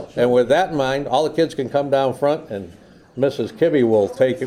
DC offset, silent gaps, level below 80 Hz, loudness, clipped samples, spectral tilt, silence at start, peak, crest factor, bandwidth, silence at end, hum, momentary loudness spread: under 0.1%; none; -54 dBFS; -19 LUFS; under 0.1%; -6 dB/octave; 0 s; -4 dBFS; 14 dB; 13.5 kHz; 0 s; none; 10 LU